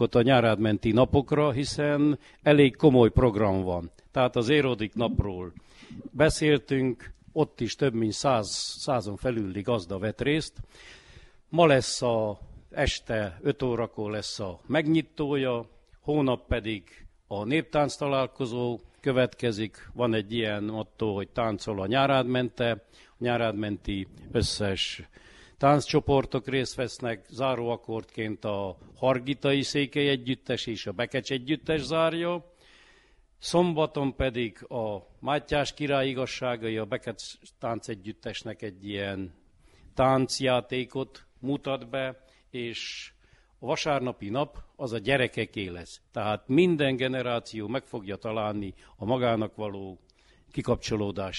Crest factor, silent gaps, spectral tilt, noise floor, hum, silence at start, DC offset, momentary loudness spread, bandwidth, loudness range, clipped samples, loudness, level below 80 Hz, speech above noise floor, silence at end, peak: 22 dB; none; -5.5 dB/octave; -60 dBFS; none; 0 s; under 0.1%; 13 LU; 11.5 kHz; 8 LU; under 0.1%; -28 LUFS; -48 dBFS; 33 dB; 0 s; -6 dBFS